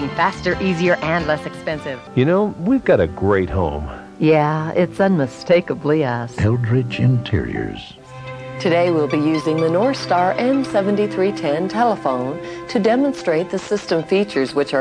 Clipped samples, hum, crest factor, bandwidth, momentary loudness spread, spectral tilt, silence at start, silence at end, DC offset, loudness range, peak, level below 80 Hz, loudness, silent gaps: under 0.1%; none; 14 dB; 10.5 kHz; 9 LU; -7 dB/octave; 0 s; 0 s; under 0.1%; 2 LU; -4 dBFS; -42 dBFS; -18 LUFS; none